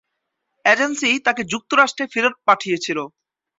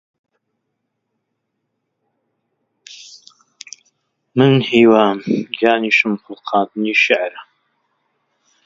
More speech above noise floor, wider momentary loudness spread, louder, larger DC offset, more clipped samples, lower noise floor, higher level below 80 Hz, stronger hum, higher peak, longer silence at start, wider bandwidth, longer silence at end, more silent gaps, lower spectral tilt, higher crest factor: about the same, 58 dB vs 59 dB; second, 8 LU vs 25 LU; second, -18 LUFS vs -15 LUFS; neither; neither; about the same, -77 dBFS vs -74 dBFS; about the same, -66 dBFS vs -64 dBFS; neither; about the same, -2 dBFS vs 0 dBFS; second, 0.65 s vs 2.9 s; about the same, 8.2 kHz vs 7.6 kHz; second, 0.5 s vs 1.25 s; neither; second, -2.5 dB/octave vs -6 dB/octave; about the same, 20 dB vs 20 dB